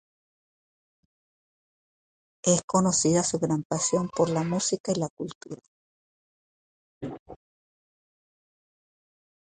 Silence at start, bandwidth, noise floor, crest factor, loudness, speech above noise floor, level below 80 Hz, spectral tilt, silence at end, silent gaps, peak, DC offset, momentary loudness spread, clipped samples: 2.45 s; 9.6 kHz; under -90 dBFS; 22 dB; -25 LUFS; over 64 dB; -62 dBFS; -4.5 dB/octave; 2.1 s; 2.64-2.68 s, 3.65-3.70 s, 4.80-4.84 s, 5.10-5.17 s, 5.35-5.41 s, 5.68-7.01 s, 7.20-7.26 s; -8 dBFS; under 0.1%; 19 LU; under 0.1%